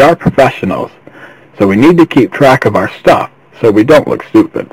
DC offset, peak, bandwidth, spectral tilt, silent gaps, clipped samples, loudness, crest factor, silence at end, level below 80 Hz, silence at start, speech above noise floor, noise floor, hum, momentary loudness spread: under 0.1%; 0 dBFS; 16 kHz; -7 dB/octave; none; 3%; -9 LUFS; 8 dB; 0.05 s; -40 dBFS; 0 s; 27 dB; -35 dBFS; none; 10 LU